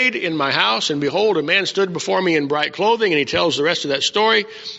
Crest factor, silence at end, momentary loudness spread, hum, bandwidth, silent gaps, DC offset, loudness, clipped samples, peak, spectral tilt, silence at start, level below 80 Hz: 18 dB; 0 s; 4 LU; none; 8 kHz; none; under 0.1%; -17 LUFS; under 0.1%; 0 dBFS; -1.5 dB/octave; 0 s; -58 dBFS